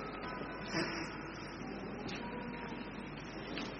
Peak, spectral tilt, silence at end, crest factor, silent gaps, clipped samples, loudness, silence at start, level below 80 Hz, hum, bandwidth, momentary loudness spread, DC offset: -24 dBFS; -3.5 dB/octave; 0 s; 18 dB; none; under 0.1%; -42 LUFS; 0 s; -58 dBFS; none; 6.6 kHz; 7 LU; under 0.1%